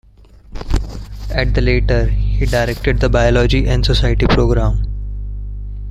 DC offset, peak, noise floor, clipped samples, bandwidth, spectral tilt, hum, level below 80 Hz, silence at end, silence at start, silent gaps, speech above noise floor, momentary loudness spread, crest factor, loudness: under 0.1%; 0 dBFS; -42 dBFS; under 0.1%; 11.5 kHz; -6.5 dB/octave; 50 Hz at -15 dBFS; -18 dBFS; 0 s; 0.5 s; none; 29 dB; 15 LU; 14 dB; -16 LUFS